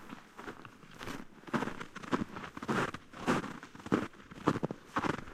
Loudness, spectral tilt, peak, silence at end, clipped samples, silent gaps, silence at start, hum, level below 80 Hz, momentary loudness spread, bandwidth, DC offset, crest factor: -37 LUFS; -5.5 dB/octave; -10 dBFS; 0 s; under 0.1%; none; 0 s; none; -60 dBFS; 13 LU; 15.5 kHz; under 0.1%; 26 dB